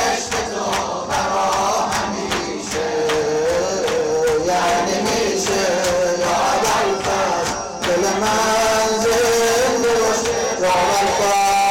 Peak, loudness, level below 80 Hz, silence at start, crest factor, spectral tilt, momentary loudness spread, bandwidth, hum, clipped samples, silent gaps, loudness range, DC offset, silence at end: -12 dBFS; -18 LUFS; -44 dBFS; 0 s; 6 dB; -2.5 dB/octave; 6 LU; 17 kHz; none; under 0.1%; none; 3 LU; under 0.1%; 0 s